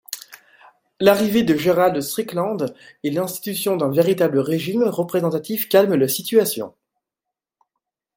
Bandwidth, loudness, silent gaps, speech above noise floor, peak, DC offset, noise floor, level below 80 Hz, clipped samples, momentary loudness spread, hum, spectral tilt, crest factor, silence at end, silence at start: 17 kHz; -19 LUFS; none; 66 dB; -2 dBFS; under 0.1%; -85 dBFS; -62 dBFS; under 0.1%; 10 LU; none; -5 dB/octave; 20 dB; 1.5 s; 0.1 s